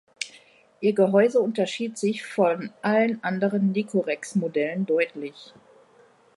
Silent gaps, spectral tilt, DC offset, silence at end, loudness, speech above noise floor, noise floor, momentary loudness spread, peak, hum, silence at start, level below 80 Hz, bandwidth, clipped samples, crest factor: none; -6 dB/octave; under 0.1%; 0.95 s; -24 LUFS; 33 dB; -57 dBFS; 9 LU; -6 dBFS; none; 0.2 s; -76 dBFS; 11.5 kHz; under 0.1%; 18 dB